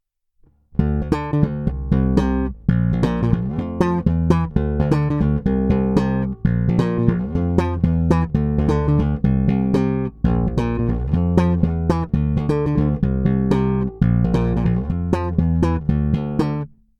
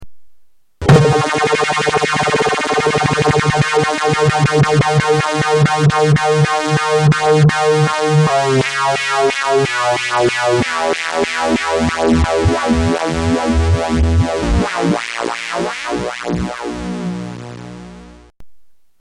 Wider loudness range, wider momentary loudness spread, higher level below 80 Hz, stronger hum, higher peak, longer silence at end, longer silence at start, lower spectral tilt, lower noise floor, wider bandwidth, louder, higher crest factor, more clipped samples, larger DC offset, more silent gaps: second, 1 LU vs 7 LU; second, 4 LU vs 9 LU; about the same, -28 dBFS vs -30 dBFS; neither; about the same, 0 dBFS vs 0 dBFS; about the same, 0.35 s vs 0.3 s; first, 0.75 s vs 0 s; first, -9.5 dB/octave vs -5.5 dB/octave; first, -57 dBFS vs -45 dBFS; second, 8.4 kHz vs 11.5 kHz; second, -20 LUFS vs -14 LUFS; about the same, 18 dB vs 14 dB; neither; neither; neither